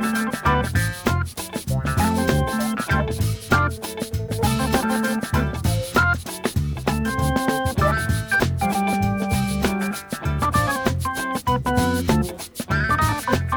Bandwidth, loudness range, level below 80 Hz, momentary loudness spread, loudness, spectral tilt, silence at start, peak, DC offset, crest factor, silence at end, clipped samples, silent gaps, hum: over 20 kHz; 1 LU; -32 dBFS; 6 LU; -22 LUFS; -5.5 dB/octave; 0 s; -4 dBFS; under 0.1%; 18 dB; 0 s; under 0.1%; none; none